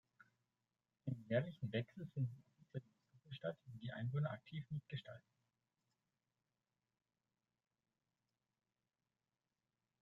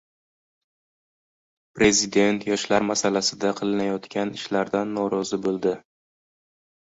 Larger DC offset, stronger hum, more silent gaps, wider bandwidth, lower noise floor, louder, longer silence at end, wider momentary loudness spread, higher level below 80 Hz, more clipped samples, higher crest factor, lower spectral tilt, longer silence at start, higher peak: neither; neither; neither; second, 4.5 kHz vs 8 kHz; about the same, under -90 dBFS vs under -90 dBFS; second, -47 LUFS vs -23 LUFS; first, 4.8 s vs 1.15 s; first, 12 LU vs 8 LU; second, -84 dBFS vs -58 dBFS; neither; about the same, 24 dB vs 20 dB; first, -9 dB/octave vs -3.5 dB/octave; second, 1.05 s vs 1.75 s; second, -26 dBFS vs -6 dBFS